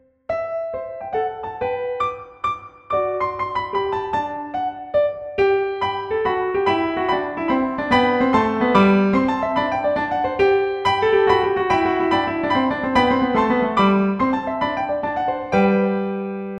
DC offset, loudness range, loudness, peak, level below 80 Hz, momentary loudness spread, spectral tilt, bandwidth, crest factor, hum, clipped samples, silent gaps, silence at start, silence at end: under 0.1%; 6 LU; -20 LUFS; -2 dBFS; -48 dBFS; 9 LU; -7 dB/octave; 9 kHz; 18 dB; none; under 0.1%; none; 0.3 s; 0 s